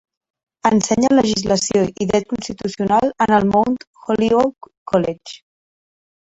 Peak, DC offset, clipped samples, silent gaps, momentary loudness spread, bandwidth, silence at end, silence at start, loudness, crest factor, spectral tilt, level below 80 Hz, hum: -2 dBFS; under 0.1%; under 0.1%; 3.87-3.94 s, 4.77-4.86 s; 11 LU; 8.4 kHz; 0.95 s; 0.65 s; -18 LUFS; 16 dB; -5 dB/octave; -48 dBFS; none